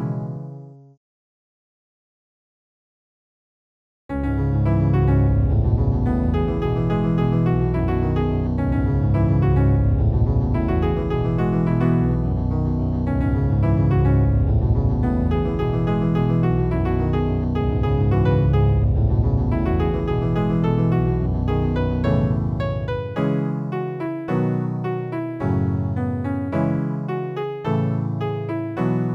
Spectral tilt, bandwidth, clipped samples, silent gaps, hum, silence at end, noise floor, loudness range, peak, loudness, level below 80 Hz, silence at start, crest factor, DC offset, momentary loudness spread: -10.5 dB/octave; 5.4 kHz; under 0.1%; 0.97-4.09 s; none; 0 s; under -90 dBFS; 4 LU; -8 dBFS; -21 LUFS; -28 dBFS; 0 s; 12 dB; under 0.1%; 8 LU